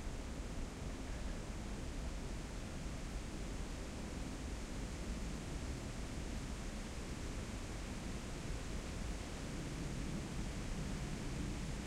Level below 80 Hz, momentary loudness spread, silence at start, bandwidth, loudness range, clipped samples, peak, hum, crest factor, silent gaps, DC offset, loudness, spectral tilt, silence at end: -46 dBFS; 3 LU; 0 s; 15.5 kHz; 2 LU; under 0.1%; -30 dBFS; none; 14 dB; none; under 0.1%; -46 LUFS; -5 dB/octave; 0 s